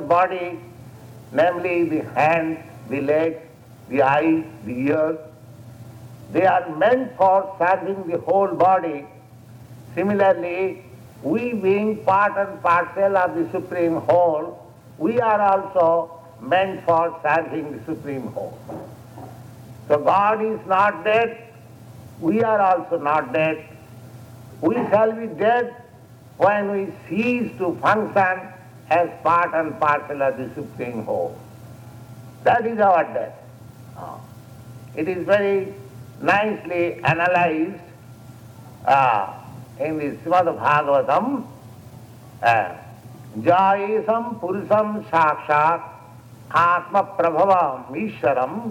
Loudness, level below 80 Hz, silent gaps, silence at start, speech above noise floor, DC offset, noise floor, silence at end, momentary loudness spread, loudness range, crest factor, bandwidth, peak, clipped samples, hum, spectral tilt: -20 LUFS; -62 dBFS; none; 0 s; 25 dB; under 0.1%; -45 dBFS; 0 s; 19 LU; 3 LU; 18 dB; 16.5 kHz; -4 dBFS; under 0.1%; none; -7 dB/octave